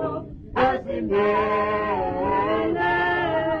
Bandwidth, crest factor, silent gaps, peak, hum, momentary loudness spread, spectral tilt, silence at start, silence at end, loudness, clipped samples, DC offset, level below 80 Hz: 6.6 kHz; 14 dB; none; -8 dBFS; none; 6 LU; -7.5 dB/octave; 0 s; 0 s; -23 LUFS; under 0.1%; under 0.1%; -44 dBFS